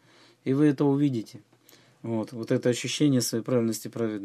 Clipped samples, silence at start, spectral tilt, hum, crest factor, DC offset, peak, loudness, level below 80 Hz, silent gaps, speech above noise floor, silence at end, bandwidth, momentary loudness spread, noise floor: under 0.1%; 0.45 s; -5.5 dB/octave; none; 16 dB; under 0.1%; -10 dBFS; -26 LUFS; -74 dBFS; none; 32 dB; 0 s; 14.5 kHz; 11 LU; -58 dBFS